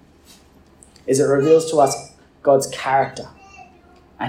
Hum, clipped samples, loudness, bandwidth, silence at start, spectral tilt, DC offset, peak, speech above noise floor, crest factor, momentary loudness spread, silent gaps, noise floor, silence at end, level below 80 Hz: none; under 0.1%; -18 LUFS; 16 kHz; 1.05 s; -4.5 dB/octave; under 0.1%; -2 dBFS; 33 dB; 18 dB; 17 LU; none; -50 dBFS; 0 s; -58 dBFS